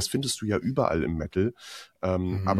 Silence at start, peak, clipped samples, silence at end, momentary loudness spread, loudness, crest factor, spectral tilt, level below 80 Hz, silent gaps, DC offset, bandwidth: 0 s; -8 dBFS; under 0.1%; 0 s; 7 LU; -28 LUFS; 20 dB; -5 dB/octave; -48 dBFS; none; under 0.1%; 14.5 kHz